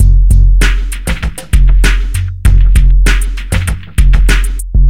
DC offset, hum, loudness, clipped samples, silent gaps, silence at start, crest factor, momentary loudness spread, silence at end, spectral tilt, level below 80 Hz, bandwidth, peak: 5%; none; -12 LUFS; 0.8%; none; 0 s; 8 dB; 8 LU; 0 s; -5 dB/octave; -8 dBFS; 13.5 kHz; 0 dBFS